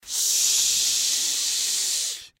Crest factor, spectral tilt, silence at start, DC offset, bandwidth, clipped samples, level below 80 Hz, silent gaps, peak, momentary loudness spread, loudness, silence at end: 16 dB; 4 dB/octave; 0.05 s; under 0.1%; 16 kHz; under 0.1%; -66 dBFS; none; -8 dBFS; 5 LU; -20 LUFS; 0.1 s